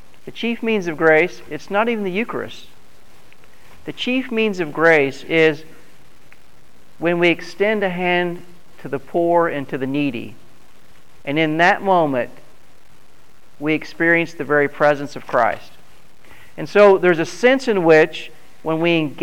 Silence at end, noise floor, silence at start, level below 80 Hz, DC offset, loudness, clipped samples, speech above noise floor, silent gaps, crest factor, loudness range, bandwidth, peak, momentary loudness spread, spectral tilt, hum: 0 s; -53 dBFS; 0.25 s; -60 dBFS; 2%; -18 LUFS; under 0.1%; 35 dB; none; 16 dB; 5 LU; 16 kHz; -2 dBFS; 18 LU; -6 dB/octave; none